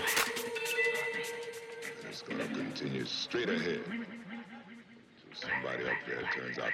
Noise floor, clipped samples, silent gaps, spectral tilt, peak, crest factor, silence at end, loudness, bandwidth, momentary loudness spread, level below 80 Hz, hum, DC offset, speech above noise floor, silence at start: -57 dBFS; under 0.1%; none; -3 dB/octave; -16 dBFS; 22 dB; 0 s; -35 LUFS; 16 kHz; 15 LU; -74 dBFS; none; under 0.1%; 21 dB; 0 s